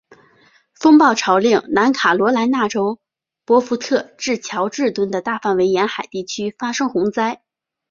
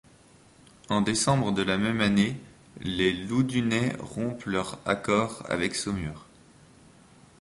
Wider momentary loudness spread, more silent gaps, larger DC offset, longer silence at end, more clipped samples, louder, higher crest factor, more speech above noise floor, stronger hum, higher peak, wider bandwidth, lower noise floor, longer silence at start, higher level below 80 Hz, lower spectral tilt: about the same, 10 LU vs 9 LU; neither; neither; second, 0.55 s vs 1.2 s; neither; first, -17 LUFS vs -27 LUFS; about the same, 16 dB vs 18 dB; first, 38 dB vs 29 dB; neither; first, -2 dBFS vs -10 dBFS; second, 7.4 kHz vs 11.5 kHz; about the same, -54 dBFS vs -56 dBFS; about the same, 0.8 s vs 0.9 s; second, -62 dBFS vs -52 dBFS; about the same, -4 dB/octave vs -5 dB/octave